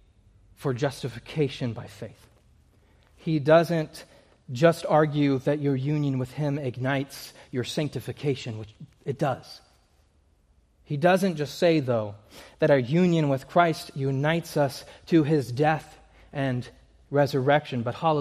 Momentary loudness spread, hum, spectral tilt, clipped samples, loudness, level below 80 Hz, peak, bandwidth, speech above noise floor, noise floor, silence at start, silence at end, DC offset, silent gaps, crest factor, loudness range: 16 LU; none; -7 dB/octave; under 0.1%; -25 LUFS; -60 dBFS; -6 dBFS; 15 kHz; 38 dB; -63 dBFS; 0.6 s; 0 s; under 0.1%; none; 20 dB; 8 LU